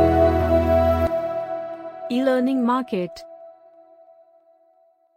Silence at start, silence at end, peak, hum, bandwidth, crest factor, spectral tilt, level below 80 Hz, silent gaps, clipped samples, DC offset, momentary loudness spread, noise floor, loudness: 0 s; 1.65 s; -6 dBFS; none; 15.5 kHz; 16 dB; -8 dB/octave; -36 dBFS; none; under 0.1%; under 0.1%; 16 LU; -60 dBFS; -21 LUFS